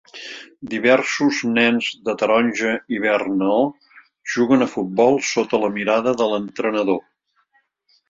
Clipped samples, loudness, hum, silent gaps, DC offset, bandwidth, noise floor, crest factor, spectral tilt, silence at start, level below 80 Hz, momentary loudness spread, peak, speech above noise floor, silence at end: under 0.1%; -19 LUFS; none; none; under 0.1%; 7.8 kHz; -64 dBFS; 18 dB; -4.5 dB/octave; 0.15 s; -62 dBFS; 9 LU; -2 dBFS; 45 dB; 1.1 s